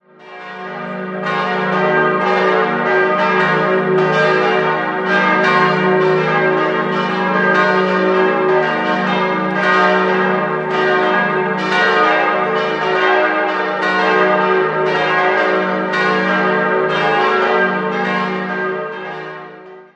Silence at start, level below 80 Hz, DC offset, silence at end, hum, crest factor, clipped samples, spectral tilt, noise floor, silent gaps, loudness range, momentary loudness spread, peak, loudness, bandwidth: 0.2 s; -60 dBFS; under 0.1%; 0.15 s; none; 14 dB; under 0.1%; -6 dB/octave; -36 dBFS; none; 2 LU; 7 LU; 0 dBFS; -14 LUFS; 8.2 kHz